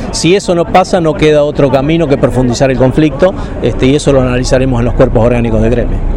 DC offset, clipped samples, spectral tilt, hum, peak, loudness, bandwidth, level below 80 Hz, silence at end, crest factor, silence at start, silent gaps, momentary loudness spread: under 0.1%; 0.2%; -6 dB/octave; none; 0 dBFS; -10 LUFS; 11.5 kHz; -18 dBFS; 0 s; 8 dB; 0 s; none; 4 LU